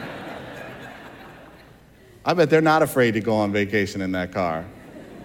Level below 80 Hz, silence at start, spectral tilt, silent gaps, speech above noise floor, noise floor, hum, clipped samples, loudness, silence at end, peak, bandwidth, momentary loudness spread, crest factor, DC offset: -56 dBFS; 0 s; -6 dB/octave; none; 29 dB; -50 dBFS; none; under 0.1%; -21 LUFS; 0 s; -6 dBFS; 17.5 kHz; 24 LU; 18 dB; under 0.1%